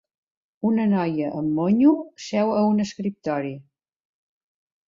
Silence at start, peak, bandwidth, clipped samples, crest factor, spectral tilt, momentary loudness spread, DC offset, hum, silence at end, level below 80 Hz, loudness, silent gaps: 0.65 s; -6 dBFS; 7.6 kHz; under 0.1%; 16 dB; -7.5 dB/octave; 10 LU; under 0.1%; none; 1.25 s; -64 dBFS; -22 LUFS; none